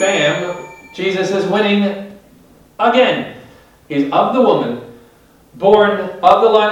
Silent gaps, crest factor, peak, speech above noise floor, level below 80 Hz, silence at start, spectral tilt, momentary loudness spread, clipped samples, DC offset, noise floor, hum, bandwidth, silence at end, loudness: none; 16 dB; 0 dBFS; 34 dB; -56 dBFS; 0 s; -5 dB/octave; 17 LU; 0.1%; under 0.1%; -48 dBFS; none; 12 kHz; 0 s; -14 LUFS